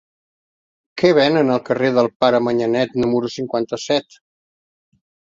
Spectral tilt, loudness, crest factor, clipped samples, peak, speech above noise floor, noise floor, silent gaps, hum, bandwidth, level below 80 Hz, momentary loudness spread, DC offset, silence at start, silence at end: -5.5 dB/octave; -18 LUFS; 18 dB; under 0.1%; -2 dBFS; over 73 dB; under -90 dBFS; 2.16-2.20 s; none; 7.8 kHz; -58 dBFS; 8 LU; under 0.1%; 0.95 s; 1.4 s